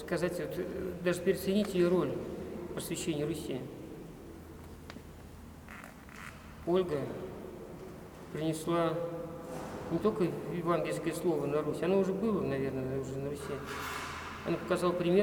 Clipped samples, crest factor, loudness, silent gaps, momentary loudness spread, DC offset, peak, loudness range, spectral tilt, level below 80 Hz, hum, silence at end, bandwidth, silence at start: under 0.1%; 20 dB; -34 LUFS; none; 18 LU; under 0.1%; -14 dBFS; 8 LU; -6 dB/octave; -58 dBFS; none; 0 s; over 20 kHz; 0 s